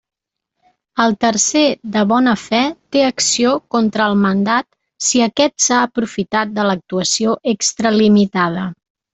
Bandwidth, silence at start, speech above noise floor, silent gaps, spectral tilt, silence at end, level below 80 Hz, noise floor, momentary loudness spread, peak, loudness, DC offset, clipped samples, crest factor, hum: 8.4 kHz; 0.95 s; 61 dB; none; -3.5 dB/octave; 0.4 s; -56 dBFS; -77 dBFS; 6 LU; 0 dBFS; -15 LUFS; under 0.1%; under 0.1%; 16 dB; none